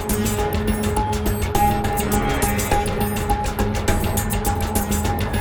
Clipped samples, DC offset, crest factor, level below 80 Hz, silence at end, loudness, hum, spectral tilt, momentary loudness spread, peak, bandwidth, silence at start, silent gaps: under 0.1%; under 0.1%; 16 dB; -28 dBFS; 0 s; -21 LUFS; none; -5 dB/octave; 3 LU; -4 dBFS; over 20 kHz; 0 s; none